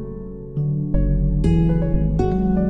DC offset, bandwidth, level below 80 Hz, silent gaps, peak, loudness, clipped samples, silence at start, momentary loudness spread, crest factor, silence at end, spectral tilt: under 0.1%; 6 kHz; -24 dBFS; none; -6 dBFS; -20 LUFS; under 0.1%; 0 s; 11 LU; 12 dB; 0 s; -10.5 dB/octave